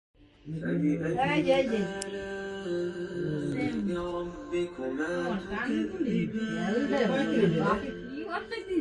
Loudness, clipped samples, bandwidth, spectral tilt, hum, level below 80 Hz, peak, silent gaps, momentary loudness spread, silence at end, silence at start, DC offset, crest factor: -30 LUFS; under 0.1%; 11.5 kHz; -6.5 dB/octave; none; -56 dBFS; -12 dBFS; none; 10 LU; 0 s; 0.2 s; under 0.1%; 18 dB